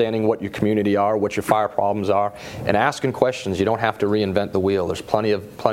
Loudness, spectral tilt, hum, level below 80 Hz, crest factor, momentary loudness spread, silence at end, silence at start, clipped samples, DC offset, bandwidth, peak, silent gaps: -21 LUFS; -6 dB/octave; none; -52 dBFS; 20 dB; 3 LU; 0 s; 0 s; under 0.1%; under 0.1%; 16 kHz; 0 dBFS; none